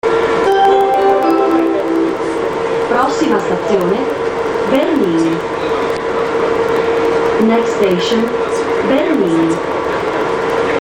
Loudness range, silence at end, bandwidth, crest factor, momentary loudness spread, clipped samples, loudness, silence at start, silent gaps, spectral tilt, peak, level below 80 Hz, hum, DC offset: 2 LU; 0 s; 16.5 kHz; 14 dB; 5 LU; under 0.1%; -14 LUFS; 0.05 s; none; -5.5 dB/octave; 0 dBFS; -44 dBFS; none; under 0.1%